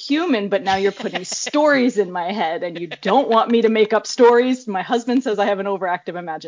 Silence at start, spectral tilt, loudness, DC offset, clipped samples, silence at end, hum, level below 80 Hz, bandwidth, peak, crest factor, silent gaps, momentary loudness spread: 0 s; -4 dB/octave; -18 LUFS; under 0.1%; under 0.1%; 0 s; none; -62 dBFS; 7.6 kHz; -2 dBFS; 16 dB; none; 10 LU